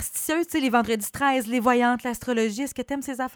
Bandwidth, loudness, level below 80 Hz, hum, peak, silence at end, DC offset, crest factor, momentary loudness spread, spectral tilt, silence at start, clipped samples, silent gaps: over 20 kHz; -24 LUFS; -56 dBFS; none; -8 dBFS; 0 s; under 0.1%; 16 dB; 8 LU; -3.5 dB/octave; 0 s; under 0.1%; none